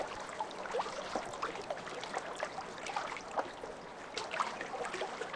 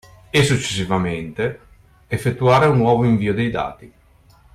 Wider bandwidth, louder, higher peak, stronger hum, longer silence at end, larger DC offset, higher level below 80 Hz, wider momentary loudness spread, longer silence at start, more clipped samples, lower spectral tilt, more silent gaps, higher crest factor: second, 11 kHz vs 14.5 kHz; second, -40 LUFS vs -19 LUFS; second, -20 dBFS vs -4 dBFS; neither; second, 0 s vs 0.65 s; neither; second, -68 dBFS vs -46 dBFS; second, 5 LU vs 11 LU; second, 0 s vs 0.35 s; neither; second, -2.5 dB/octave vs -6 dB/octave; neither; first, 20 dB vs 14 dB